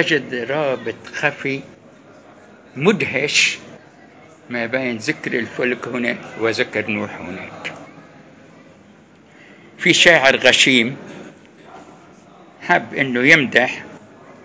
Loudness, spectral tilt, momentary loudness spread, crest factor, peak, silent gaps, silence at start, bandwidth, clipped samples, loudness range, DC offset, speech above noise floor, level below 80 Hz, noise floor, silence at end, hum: -16 LUFS; -3 dB/octave; 20 LU; 20 dB; 0 dBFS; none; 0 s; 8 kHz; under 0.1%; 9 LU; under 0.1%; 29 dB; -60 dBFS; -47 dBFS; 0.45 s; none